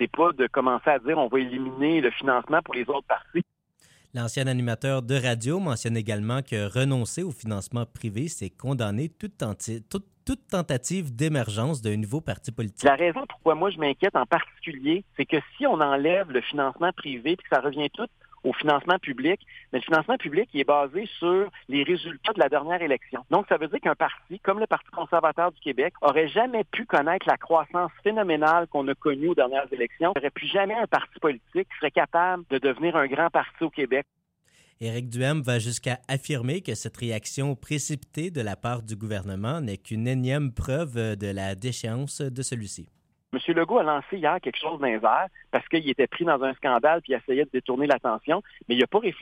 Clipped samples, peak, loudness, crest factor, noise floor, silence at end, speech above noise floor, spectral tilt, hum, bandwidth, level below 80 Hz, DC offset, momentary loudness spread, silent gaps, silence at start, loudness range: under 0.1%; -6 dBFS; -26 LUFS; 20 dB; -63 dBFS; 0 s; 37 dB; -5.5 dB/octave; none; 16 kHz; -56 dBFS; under 0.1%; 9 LU; none; 0 s; 5 LU